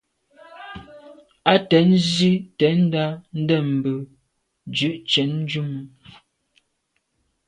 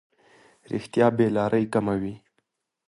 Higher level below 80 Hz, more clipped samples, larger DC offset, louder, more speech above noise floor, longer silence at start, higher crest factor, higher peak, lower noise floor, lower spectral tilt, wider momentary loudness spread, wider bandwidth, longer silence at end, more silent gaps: about the same, -60 dBFS vs -58 dBFS; neither; neither; first, -20 LUFS vs -24 LUFS; about the same, 53 dB vs 52 dB; second, 0.55 s vs 0.7 s; about the same, 22 dB vs 20 dB; first, 0 dBFS vs -6 dBFS; about the same, -72 dBFS vs -75 dBFS; second, -6 dB/octave vs -7.5 dB/octave; first, 22 LU vs 13 LU; second, 10 kHz vs 11.5 kHz; first, 1.6 s vs 0.7 s; neither